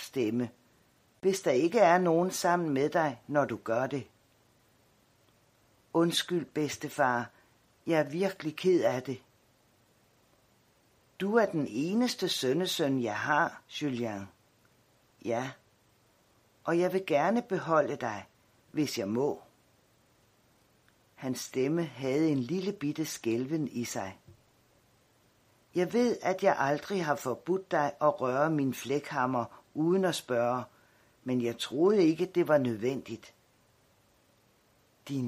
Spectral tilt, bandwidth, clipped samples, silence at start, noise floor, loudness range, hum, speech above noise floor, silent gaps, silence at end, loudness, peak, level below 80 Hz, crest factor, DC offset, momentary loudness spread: -5 dB/octave; 15.5 kHz; under 0.1%; 0 s; -67 dBFS; 7 LU; none; 38 dB; none; 0 s; -30 LUFS; -12 dBFS; -76 dBFS; 20 dB; under 0.1%; 11 LU